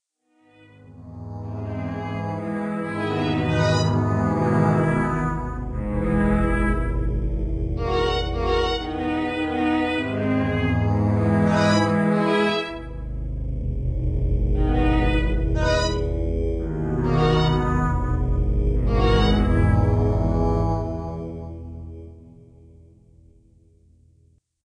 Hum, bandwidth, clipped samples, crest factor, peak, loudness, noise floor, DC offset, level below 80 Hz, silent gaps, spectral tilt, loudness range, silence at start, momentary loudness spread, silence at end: none; 10 kHz; under 0.1%; 16 dB; -6 dBFS; -23 LUFS; -62 dBFS; under 0.1%; -28 dBFS; none; -7 dB/octave; 6 LU; 0.9 s; 11 LU; 2.4 s